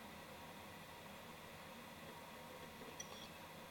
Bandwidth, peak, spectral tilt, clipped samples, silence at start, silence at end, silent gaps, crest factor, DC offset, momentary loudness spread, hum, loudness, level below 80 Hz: 17.5 kHz; -36 dBFS; -3 dB/octave; under 0.1%; 0 s; 0 s; none; 20 dB; under 0.1%; 3 LU; none; -54 LUFS; -76 dBFS